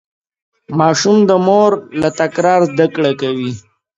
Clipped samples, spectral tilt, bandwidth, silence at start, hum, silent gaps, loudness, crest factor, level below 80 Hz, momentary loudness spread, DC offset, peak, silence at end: under 0.1%; -5.5 dB/octave; 8 kHz; 0.7 s; none; none; -13 LUFS; 14 dB; -56 dBFS; 11 LU; under 0.1%; 0 dBFS; 0.4 s